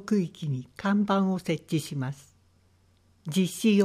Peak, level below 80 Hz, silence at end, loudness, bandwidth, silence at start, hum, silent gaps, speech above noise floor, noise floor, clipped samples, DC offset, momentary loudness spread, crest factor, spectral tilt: -12 dBFS; -68 dBFS; 0 s; -28 LUFS; 15 kHz; 0 s; none; none; 37 dB; -63 dBFS; under 0.1%; under 0.1%; 10 LU; 16 dB; -6 dB/octave